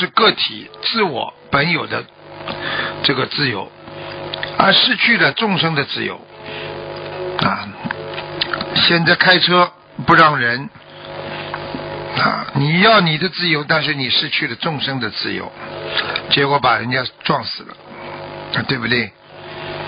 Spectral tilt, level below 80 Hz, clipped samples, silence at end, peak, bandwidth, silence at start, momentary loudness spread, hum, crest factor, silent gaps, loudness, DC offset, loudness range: -7.5 dB/octave; -50 dBFS; under 0.1%; 0 s; 0 dBFS; 5.4 kHz; 0 s; 19 LU; none; 18 dB; none; -16 LUFS; under 0.1%; 6 LU